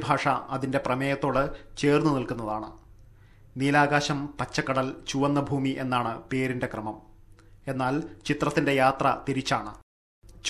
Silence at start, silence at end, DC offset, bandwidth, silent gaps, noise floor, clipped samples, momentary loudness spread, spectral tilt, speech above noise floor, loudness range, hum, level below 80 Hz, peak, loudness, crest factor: 0 s; 0 s; under 0.1%; 13 kHz; 9.83-10.22 s; -53 dBFS; under 0.1%; 11 LU; -5.5 dB/octave; 26 dB; 3 LU; none; -52 dBFS; -6 dBFS; -27 LUFS; 20 dB